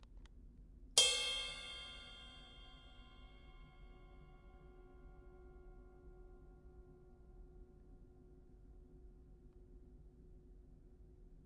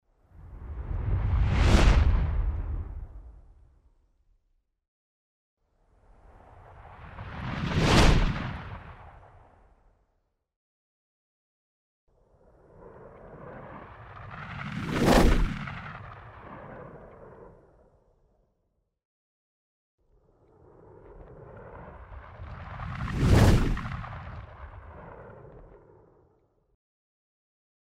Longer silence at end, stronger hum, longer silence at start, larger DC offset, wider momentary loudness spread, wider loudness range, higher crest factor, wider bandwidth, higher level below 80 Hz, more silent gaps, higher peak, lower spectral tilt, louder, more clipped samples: second, 0 s vs 2.25 s; neither; second, 0 s vs 0.45 s; neither; about the same, 27 LU vs 28 LU; first, 25 LU vs 22 LU; first, 34 dB vs 24 dB; second, 11.5 kHz vs 15.5 kHz; second, -60 dBFS vs -34 dBFS; second, none vs 4.88-5.57 s, 10.56-12.07 s, 19.05-19.98 s; second, -12 dBFS vs -6 dBFS; second, 0 dB/octave vs -6 dB/octave; second, -36 LUFS vs -26 LUFS; neither